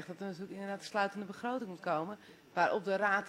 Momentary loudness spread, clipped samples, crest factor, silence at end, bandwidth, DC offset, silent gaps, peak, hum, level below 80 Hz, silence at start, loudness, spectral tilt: 11 LU; under 0.1%; 20 dB; 0 s; 16 kHz; under 0.1%; none; -16 dBFS; none; -84 dBFS; 0 s; -36 LUFS; -5 dB/octave